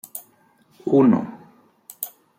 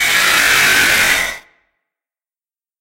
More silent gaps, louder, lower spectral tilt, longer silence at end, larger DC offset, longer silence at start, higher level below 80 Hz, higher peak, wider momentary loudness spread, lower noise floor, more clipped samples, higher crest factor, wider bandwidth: neither; second, -20 LUFS vs -11 LUFS; first, -7.5 dB/octave vs 0.5 dB/octave; second, 0.3 s vs 1.4 s; neither; first, 0.15 s vs 0 s; second, -70 dBFS vs -44 dBFS; second, -6 dBFS vs 0 dBFS; first, 20 LU vs 11 LU; second, -58 dBFS vs under -90 dBFS; neither; about the same, 18 dB vs 16 dB; about the same, 16.5 kHz vs 16 kHz